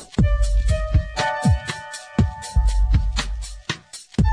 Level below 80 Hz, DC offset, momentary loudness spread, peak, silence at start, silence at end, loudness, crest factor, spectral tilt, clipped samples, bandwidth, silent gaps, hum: -22 dBFS; under 0.1%; 10 LU; -6 dBFS; 0 s; 0 s; -23 LUFS; 14 dB; -5.5 dB/octave; under 0.1%; 10.5 kHz; none; none